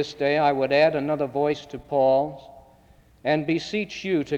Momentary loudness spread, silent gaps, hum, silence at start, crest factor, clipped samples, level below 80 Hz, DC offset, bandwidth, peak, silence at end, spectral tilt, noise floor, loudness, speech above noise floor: 10 LU; none; none; 0 s; 16 dB; under 0.1%; -58 dBFS; under 0.1%; 8.6 kHz; -8 dBFS; 0 s; -6 dB/octave; -55 dBFS; -23 LUFS; 32 dB